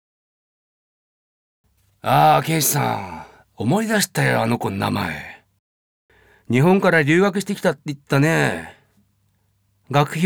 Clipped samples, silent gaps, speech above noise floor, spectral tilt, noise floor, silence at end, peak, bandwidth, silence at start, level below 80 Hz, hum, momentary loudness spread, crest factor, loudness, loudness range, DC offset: under 0.1%; 5.59-6.09 s; 46 dB; -5 dB/octave; -65 dBFS; 0 s; -4 dBFS; over 20 kHz; 2.05 s; -58 dBFS; none; 15 LU; 18 dB; -19 LUFS; 3 LU; under 0.1%